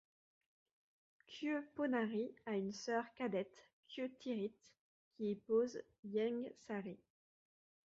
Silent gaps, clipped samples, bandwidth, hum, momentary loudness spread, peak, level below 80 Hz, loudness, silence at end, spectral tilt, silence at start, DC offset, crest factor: 3.73-3.83 s, 4.79-5.11 s, 5.99-6.03 s; under 0.1%; 7.6 kHz; none; 12 LU; -26 dBFS; -86 dBFS; -43 LUFS; 0.95 s; -5 dB/octave; 1.3 s; under 0.1%; 18 dB